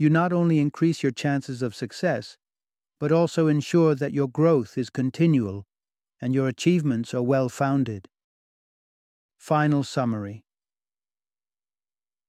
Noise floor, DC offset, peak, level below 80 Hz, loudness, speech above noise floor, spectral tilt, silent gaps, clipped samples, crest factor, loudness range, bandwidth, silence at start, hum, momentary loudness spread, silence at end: under -90 dBFS; under 0.1%; -8 dBFS; -68 dBFS; -24 LUFS; over 67 dB; -7 dB/octave; 8.24-9.29 s; under 0.1%; 16 dB; 6 LU; 12.5 kHz; 0 s; none; 10 LU; 1.9 s